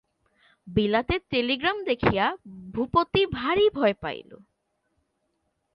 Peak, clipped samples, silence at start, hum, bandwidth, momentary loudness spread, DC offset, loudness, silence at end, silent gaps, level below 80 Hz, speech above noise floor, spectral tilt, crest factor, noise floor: -6 dBFS; under 0.1%; 0.65 s; none; 5.6 kHz; 11 LU; under 0.1%; -25 LUFS; 1.4 s; none; -48 dBFS; 50 dB; -8 dB/octave; 20 dB; -75 dBFS